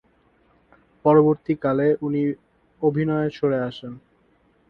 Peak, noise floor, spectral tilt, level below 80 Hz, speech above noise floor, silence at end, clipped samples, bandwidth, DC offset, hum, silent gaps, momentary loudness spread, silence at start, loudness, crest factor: -4 dBFS; -61 dBFS; -10 dB/octave; -60 dBFS; 41 dB; 0.7 s; under 0.1%; 5.6 kHz; under 0.1%; none; none; 14 LU; 1.05 s; -22 LUFS; 18 dB